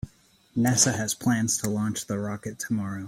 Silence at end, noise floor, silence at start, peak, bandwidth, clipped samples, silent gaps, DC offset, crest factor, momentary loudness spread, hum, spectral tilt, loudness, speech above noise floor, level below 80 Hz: 0 s; -59 dBFS; 0.05 s; -8 dBFS; 16.5 kHz; under 0.1%; none; under 0.1%; 20 dB; 13 LU; none; -4 dB/octave; -26 LUFS; 33 dB; -56 dBFS